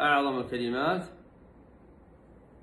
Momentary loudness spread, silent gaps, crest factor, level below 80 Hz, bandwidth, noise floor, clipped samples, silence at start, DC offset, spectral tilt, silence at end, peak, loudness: 9 LU; none; 18 dB; -60 dBFS; 12 kHz; -55 dBFS; under 0.1%; 0 s; under 0.1%; -6 dB/octave; 1.45 s; -12 dBFS; -29 LUFS